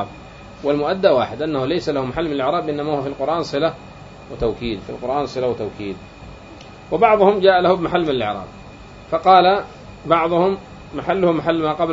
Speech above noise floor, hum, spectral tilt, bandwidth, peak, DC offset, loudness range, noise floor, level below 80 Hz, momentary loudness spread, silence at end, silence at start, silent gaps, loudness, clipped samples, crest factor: 21 dB; none; -6.5 dB/octave; 7.8 kHz; 0 dBFS; under 0.1%; 7 LU; -39 dBFS; -44 dBFS; 24 LU; 0 s; 0 s; none; -18 LUFS; under 0.1%; 18 dB